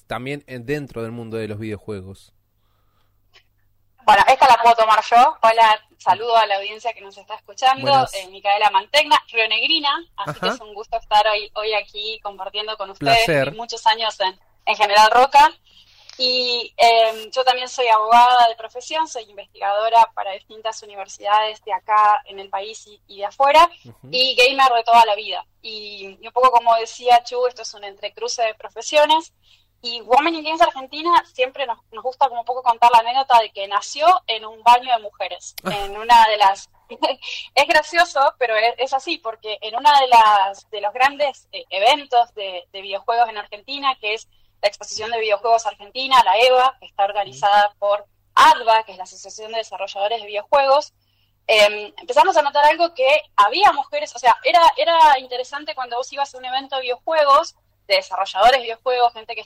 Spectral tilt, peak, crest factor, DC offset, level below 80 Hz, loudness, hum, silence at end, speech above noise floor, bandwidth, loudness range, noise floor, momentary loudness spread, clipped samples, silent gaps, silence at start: -2.5 dB/octave; -4 dBFS; 14 dB; under 0.1%; -54 dBFS; -17 LUFS; none; 0 s; 44 dB; 16 kHz; 5 LU; -62 dBFS; 16 LU; under 0.1%; none; 0.1 s